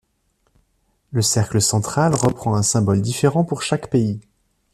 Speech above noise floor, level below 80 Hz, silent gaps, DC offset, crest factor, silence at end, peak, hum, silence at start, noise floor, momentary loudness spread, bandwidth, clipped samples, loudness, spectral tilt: 48 dB; -50 dBFS; none; under 0.1%; 18 dB; 0.55 s; -2 dBFS; none; 1.1 s; -66 dBFS; 5 LU; 14 kHz; under 0.1%; -19 LUFS; -5 dB/octave